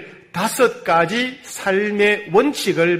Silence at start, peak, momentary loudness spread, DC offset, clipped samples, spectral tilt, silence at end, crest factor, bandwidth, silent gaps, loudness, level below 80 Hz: 0 s; -4 dBFS; 8 LU; under 0.1%; under 0.1%; -4 dB/octave; 0 s; 16 dB; 16 kHz; none; -18 LUFS; -60 dBFS